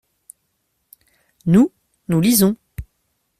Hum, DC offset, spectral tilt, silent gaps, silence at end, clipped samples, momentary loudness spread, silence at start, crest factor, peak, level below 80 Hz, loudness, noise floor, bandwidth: none; under 0.1%; -5.5 dB/octave; none; 0.55 s; under 0.1%; 22 LU; 1.45 s; 18 dB; -2 dBFS; -48 dBFS; -17 LUFS; -70 dBFS; 16 kHz